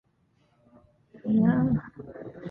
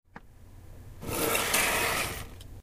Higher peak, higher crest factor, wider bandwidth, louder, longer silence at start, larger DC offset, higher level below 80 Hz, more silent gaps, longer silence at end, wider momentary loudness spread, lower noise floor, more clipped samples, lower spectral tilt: about the same, -10 dBFS vs -12 dBFS; about the same, 18 dB vs 20 dB; second, 3.7 kHz vs 16 kHz; about the same, -25 LUFS vs -27 LUFS; first, 1.15 s vs 0.15 s; neither; second, -54 dBFS vs -48 dBFS; neither; about the same, 0 s vs 0 s; first, 20 LU vs 17 LU; first, -68 dBFS vs -50 dBFS; neither; first, -12 dB/octave vs -2 dB/octave